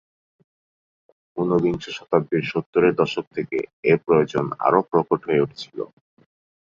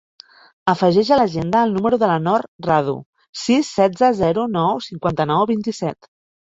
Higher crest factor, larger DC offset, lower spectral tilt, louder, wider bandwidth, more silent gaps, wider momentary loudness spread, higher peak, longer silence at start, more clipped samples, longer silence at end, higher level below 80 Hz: about the same, 20 dB vs 18 dB; neither; about the same, -7 dB/octave vs -6 dB/octave; second, -22 LUFS vs -18 LUFS; about the same, 7.4 kHz vs 8 kHz; about the same, 2.66-2.73 s, 3.27-3.31 s, 3.73-3.83 s vs 2.48-2.59 s, 3.06-3.13 s, 3.29-3.33 s; first, 12 LU vs 9 LU; about the same, -4 dBFS vs -2 dBFS; first, 1.35 s vs 0.65 s; neither; first, 0.9 s vs 0.65 s; second, -58 dBFS vs -52 dBFS